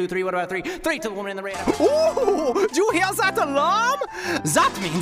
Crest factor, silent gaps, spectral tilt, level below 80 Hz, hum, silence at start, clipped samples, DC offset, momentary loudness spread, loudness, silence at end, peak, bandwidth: 16 dB; none; -3.5 dB/octave; -52 dBFS; none; 0 s; under 0.1%; under 0.1%; 7 LU; -21 LUFS; 0 s; -6 dBFS; 16 kHz